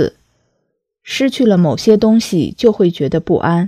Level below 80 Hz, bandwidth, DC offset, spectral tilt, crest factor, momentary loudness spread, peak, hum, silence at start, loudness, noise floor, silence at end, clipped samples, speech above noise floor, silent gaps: -46 dBFS; 15 kHz; under 0.1%; -6.5 dB/octave; 14 dB; 7 LU; 0 dBFS; none; 0 s; -14 LUFS; -69 dBFS; 0 s; under 0.1%; 56 dB; none